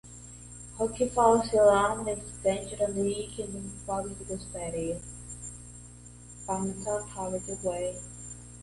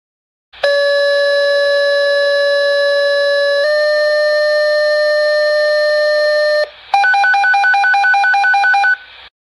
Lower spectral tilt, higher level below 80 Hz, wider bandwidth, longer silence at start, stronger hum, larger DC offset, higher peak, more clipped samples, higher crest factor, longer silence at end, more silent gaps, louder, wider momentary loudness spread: first, -4.5 dB/octave vs 1 dB/octave; first, -50 dBFS vs -62 dBFS; about the same, 11.5 kHz vs 11.5 kHz; second, 0.05 s vs 0.55 s; first, 60 Hz at -45 dBFS vs none; neither; second, -10 dBFS vs -2 dBFS; neither; first, 20 dB vs 12 dB; second, 0 s vs 0.2 s; neither; second, -29 LUFS vs -12 LUFS; first, 22 LU vs 3 LU